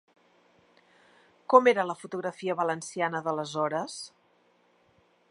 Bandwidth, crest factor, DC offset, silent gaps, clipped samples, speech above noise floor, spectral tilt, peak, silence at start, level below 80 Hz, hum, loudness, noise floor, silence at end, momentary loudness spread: 11.5 kHz; 26 dB; under 0.1%; none; under 0.1%; 39 dB; -4.5 dB/octave; -4 dBFS; 1.5 s; -82 dBFS; none; -27 LUFS; -66 dBFS; 1.25 s; 18 LU